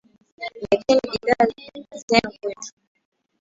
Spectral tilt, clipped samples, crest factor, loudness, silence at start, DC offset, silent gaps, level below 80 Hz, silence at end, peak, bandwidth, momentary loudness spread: -4 dB/octave; under 0.1%; 22 dB; -21 LUFS; 0.4 s; under 0.1%; 2.03-2.08 s; -56 dBFS; 0.7 s; 0 dBFS; 8 kHz; 19 LU